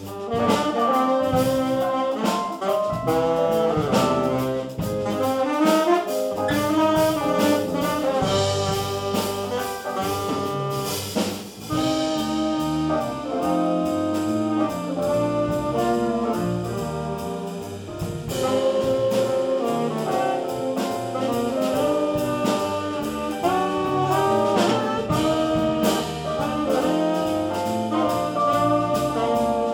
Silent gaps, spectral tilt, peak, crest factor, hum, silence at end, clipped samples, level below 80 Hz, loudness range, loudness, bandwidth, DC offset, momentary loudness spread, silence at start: none; -5.5 dB/octave; -6 dBFS; 16 dB; none; 0 s; under 0.1%; -50 dBFS; 3 LU; -23 LUFS; 19 kHz; under 0.1%; 7 LU; 0 s